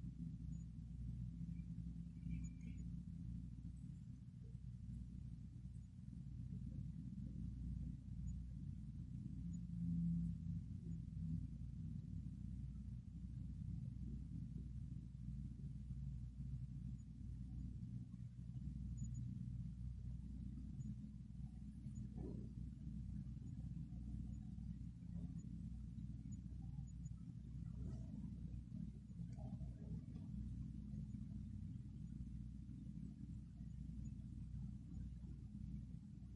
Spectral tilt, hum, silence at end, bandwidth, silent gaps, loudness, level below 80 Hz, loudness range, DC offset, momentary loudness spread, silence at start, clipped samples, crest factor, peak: -9 dB/octave; none; 0 s; 10.5 kHz; none; -52 LUFS; -56 dBFS; 5 LU; under 0.1%; 5 LU; 0 s; under 0.1%; 16 dB; -34 dBFS